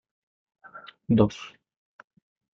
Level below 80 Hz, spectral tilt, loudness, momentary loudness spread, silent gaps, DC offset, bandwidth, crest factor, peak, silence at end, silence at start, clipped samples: -56 dBFS; -8 dB/octave; -24 LUFS; 23 LU; none; under 0.1%; 7.4 kHz; 22 dB; -8 dBFS; 1.1 s; 0.75 s; under 0.1%